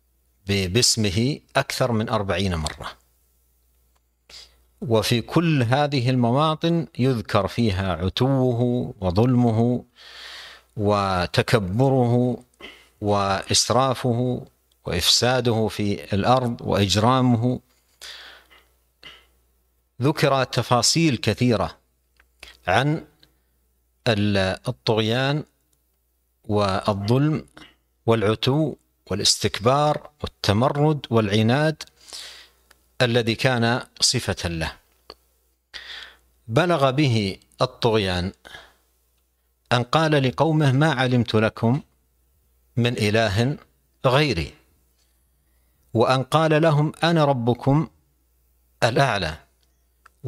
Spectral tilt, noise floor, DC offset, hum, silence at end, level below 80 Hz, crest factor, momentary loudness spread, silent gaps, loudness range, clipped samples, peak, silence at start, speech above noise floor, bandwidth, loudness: -5 dB/octave; -68 dBFS; under 0.1%; none; 0 s; -48 dBFS; 22 dB; 15 LU; none; 4 LU; under 0.1%; -2 dBFS; 0.45 s; 48 dB; 14.5 kHz; -21 LUFS